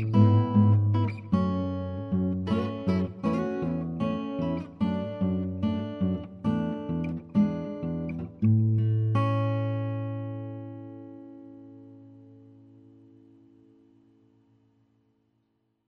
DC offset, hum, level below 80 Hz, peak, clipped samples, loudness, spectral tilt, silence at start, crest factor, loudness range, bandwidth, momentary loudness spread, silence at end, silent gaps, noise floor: under 0.1%; none; -56 dBFS; -10 dBFS; under 0.1%; -28 LUFS; -10 dB/octave; 0 s; 18 dB; 12 LU; 5.2 kHz; 18 LU; 3.55 s; none; -74 dBFS